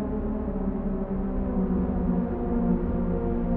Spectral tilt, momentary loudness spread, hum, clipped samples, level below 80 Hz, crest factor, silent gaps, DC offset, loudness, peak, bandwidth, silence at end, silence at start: -11.5 dB/octave; 4 LU; none; under 0.1%; -32 dBFS; 14 dB; none; under 0.1%; -28 LUFS; -12 dBFS; 3.2 kHz; 0 s; 0 s